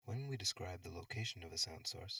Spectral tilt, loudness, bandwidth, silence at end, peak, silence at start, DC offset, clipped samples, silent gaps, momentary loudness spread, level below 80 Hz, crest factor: -3 dB/octave; -43 LUFS; over 20 kHz; 0 s; -26 dBFS; 0.05 s; under 0.1%; under 0.1%; none; 8 LU; -68 dBFS; 20 dB